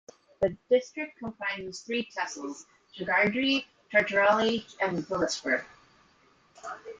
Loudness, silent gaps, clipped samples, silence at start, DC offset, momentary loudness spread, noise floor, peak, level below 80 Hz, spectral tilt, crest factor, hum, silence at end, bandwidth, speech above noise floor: -28 LUFS; none; under 0.1%; 0.4 s; under 0.1%; 16 LU; -63 dBFS; -10 dBFS; -64 dBFS; -4 dB/octave; 20 dB; none; 0.05 s; 9.4 kHz; 34 dB